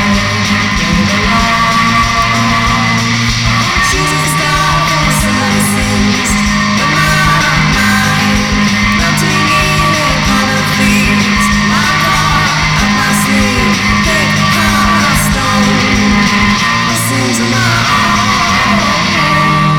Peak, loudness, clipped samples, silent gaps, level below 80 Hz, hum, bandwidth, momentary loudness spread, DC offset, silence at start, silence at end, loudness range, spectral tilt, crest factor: 0 dBFS; -9 LUFS; under 0.1%; none; -24 dBFS; none; 19.5 kHz; 2 LU; 0.2%; 0 s; 0 s; 1 LU; -3.5 dB/octave; 10 dB